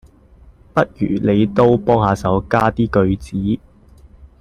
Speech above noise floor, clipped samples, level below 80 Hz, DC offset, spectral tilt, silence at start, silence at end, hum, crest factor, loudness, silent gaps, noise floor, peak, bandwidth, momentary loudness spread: 30 dB; under 0.1%; -38 dBFS; under 0.1%; -8 dB/octave; 0.75 s; 0.15 s; none; 16 dB; -17 LUFS; none; -46 dBFS; -2 dBFS; 11.5 kHz; 8 LU